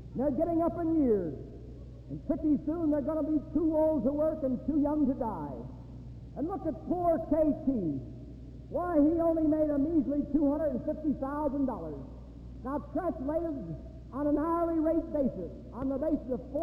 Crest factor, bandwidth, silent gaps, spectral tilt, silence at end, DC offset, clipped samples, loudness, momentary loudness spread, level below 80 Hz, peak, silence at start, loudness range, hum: 16 dB; 2.8 kHz; none; -11 dB/octave; 0 s; under 0.1%; under 0.1%; -31 LUFS; 16 LU; -48 dBFS; -16 dBFS; 0 s; 4 LU; none